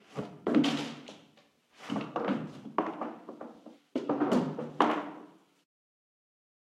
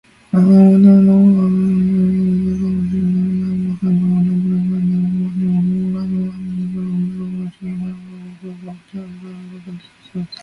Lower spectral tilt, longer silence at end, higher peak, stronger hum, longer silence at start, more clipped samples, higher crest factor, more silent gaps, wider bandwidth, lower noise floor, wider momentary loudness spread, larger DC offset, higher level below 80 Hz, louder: second, -6 dB/octave vs -10.5 dB/octave; first, 1.4 s vs 0.1 s; second, -10 dBFS vs 0 dBFS; neither; second, 0.1 s vs 0.35 s; neither; first, 26 dB vs 14 dB; neither; first, 12 kHz vs 5.2 kHz; first, -64 dBFS vs -35 dBFS; second, 19 LU vs 24 LU; neither; second, -80 dBFS vs -46 dBFS; second, -33 LUFS vs -15 LUFS